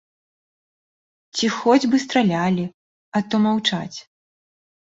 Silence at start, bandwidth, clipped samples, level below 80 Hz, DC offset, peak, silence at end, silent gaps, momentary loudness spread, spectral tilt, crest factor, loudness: 1.35 s; 8 kHz; under 0.1%; -62 dBFS; under 0.1%; -4 dBFS; 0.95 s; 2.74-3.12 s; 13 LU; -5 dB/octave; 20 dB; -20 LUFS